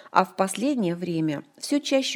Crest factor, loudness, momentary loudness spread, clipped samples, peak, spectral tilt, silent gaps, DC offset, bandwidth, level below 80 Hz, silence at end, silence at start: 22 dB; -26 LUFS; 5 LU; under 0.1%; -2 dBFS; -4.5 dB/octave; none; under 0.1%; 18 kHz; -74 dBFS; 0 s; 0.05 s